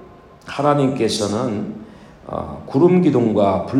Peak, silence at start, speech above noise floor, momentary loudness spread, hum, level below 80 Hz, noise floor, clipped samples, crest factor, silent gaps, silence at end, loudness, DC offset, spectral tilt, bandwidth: -2 dBFS; 0 s; 24 dB; 16 LU; none; -52 dBFS; -41 dBFS; under 0.1%; 16 dB; none; 0 s; -18 LUFS; under 0.1%; -6.5 dB/octave; 12 kHz